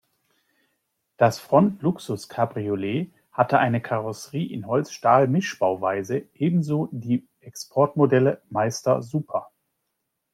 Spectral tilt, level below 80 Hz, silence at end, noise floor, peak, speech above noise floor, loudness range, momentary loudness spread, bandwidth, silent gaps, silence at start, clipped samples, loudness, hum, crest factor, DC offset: -6.5 dB/octave; -66 dBFS; 0.9 s; -78 dBFS; -4 dBFS; 56 dB; 2 LU; 11 LU; 15.5 kHz; none; 1.2 s; under 0.1%; -23 LUFS; none; 20 dB; under 0.1%